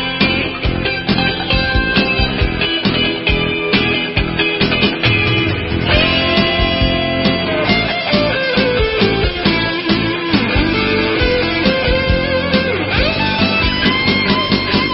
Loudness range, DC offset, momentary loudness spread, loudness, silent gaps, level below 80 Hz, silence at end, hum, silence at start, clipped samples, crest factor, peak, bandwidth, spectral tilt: 1 LU; under 0.1%; 3 LU; -14 LUFS; none; -26 dBFS; 0 s; none; 0 s; under 0.1%; 14 dB; 0 dBFS; 5.8 kHz; -9 dB/octave